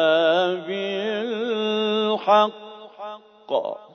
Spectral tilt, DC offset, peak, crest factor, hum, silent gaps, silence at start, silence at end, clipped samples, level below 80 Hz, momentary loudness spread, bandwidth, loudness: -5 dB/octave; under 0.1%; -6 dBFS; 16 dB; none; none; 0 s; 0.1 s; under 0.1%; -84 dBFS; 19 LU; 6.6 kHz; -22 LUFS